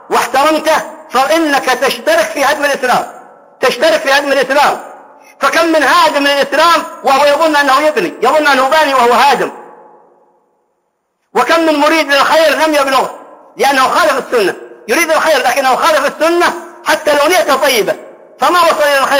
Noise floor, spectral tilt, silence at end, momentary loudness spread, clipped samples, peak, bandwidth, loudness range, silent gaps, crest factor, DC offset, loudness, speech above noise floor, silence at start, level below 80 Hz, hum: -65 dBFS; -2 dB/octave; 0 s; 6 LU; under 0.1%; 0 dBFS; 16.5 kHz; 3 LU; none; 12 dB; under 0.1%; -10 LUFS; 54 dB; 0.1 s; -54 dBFS; none